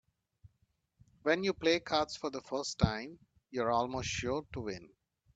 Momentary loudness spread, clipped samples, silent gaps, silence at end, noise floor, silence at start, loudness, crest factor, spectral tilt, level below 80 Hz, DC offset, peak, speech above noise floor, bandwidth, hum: 12 LU; under 0.1%; none; 0.5 s; -77 dBFS; 1.25 s; -34 LUFS; 24 dB; -4.5 dB/octave; -56 dBFS; under 0.1%; -12 dBFS; 43 dB; 9 kHz; none